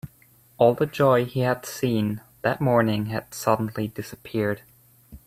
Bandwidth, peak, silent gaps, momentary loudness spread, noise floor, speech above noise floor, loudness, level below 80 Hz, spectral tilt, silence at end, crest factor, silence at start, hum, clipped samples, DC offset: 16 kHz; -4 dBFS; none; 11 LU; -57 dBFS; 34 dB; -24 LUFS; -56 dBFS; -6.5 dB/octave; 0.1 s; 20 dB; 0.05 s; none; under 0.1%; under 0.1%